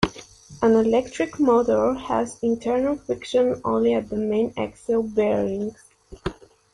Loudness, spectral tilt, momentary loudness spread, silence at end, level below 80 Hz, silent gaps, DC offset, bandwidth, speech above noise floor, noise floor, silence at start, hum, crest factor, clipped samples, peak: -22 LUFS; -6 dB/octave; 11 LU; 0.4 s; -48 dBFS; none; under 0.1%; 11.5 kHz; 23 dB; -44 dBFS; 0 s; none; 20 dB; under 0.1%; -2 dBFS